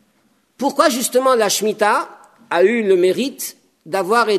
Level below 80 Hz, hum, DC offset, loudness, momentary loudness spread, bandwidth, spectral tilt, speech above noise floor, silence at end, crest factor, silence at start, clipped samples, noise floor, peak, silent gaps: -74 dBFS; none; under 0.1%; -17 LUFS; 9 LU; 13.5 kHz; -3 dB/octave; 44 dB; 0 s; 16 dB; 0.6 s; under 0.1%; -60 dBFS; 0 dBFS; none